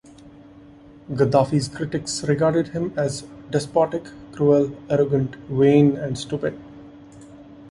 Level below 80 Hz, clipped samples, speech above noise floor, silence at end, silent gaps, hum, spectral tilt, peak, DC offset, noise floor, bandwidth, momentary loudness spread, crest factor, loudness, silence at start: -52 dBFS; under 0.1%; 25 dB; 0 s; none; none; -6.5 dB/octave; -2 dBFS; under 0.1%; -46 dBFS; 11.5 kHz; 11 LU; 20 dB; -21 LUFS; 0.25 s